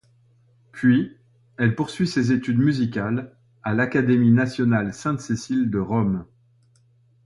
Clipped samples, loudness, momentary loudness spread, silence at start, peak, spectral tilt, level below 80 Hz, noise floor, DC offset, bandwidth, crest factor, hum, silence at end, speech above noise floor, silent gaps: under 0.1%; -22 LUFS; 9 LU; 0.75 s; -6 dBFS; -7 dB/octave; -54 dBFS; -59 dBFS; under 0.1%; 11.5 kHz; 16 dB; none; 1 s; 38 dB; none